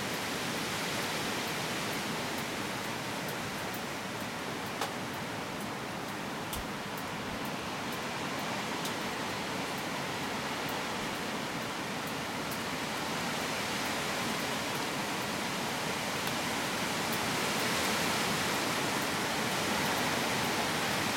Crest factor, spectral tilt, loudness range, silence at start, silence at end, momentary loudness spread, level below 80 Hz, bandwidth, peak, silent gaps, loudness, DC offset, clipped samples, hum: 18 dB; -3 dB/octave; 6 LU; 0 s; 0 s; 7 LU; -62 dBFS; 16.5 kHz; -16 dBFS; none; -33 LUFS; under 0.1%; under 0.1%; none